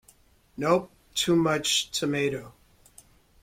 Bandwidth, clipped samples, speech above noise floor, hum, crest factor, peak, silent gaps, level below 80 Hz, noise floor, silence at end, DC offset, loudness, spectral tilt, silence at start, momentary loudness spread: 16.5 kHz; under 0.1%; 34 dB; none; 20 dB; -8 dBFS; none; -60 dBFS; -60 dBFS; 0.95 s; under 0.1%; -26 LUFS; -3.5 dB/octave; 0.6 s; 10 LU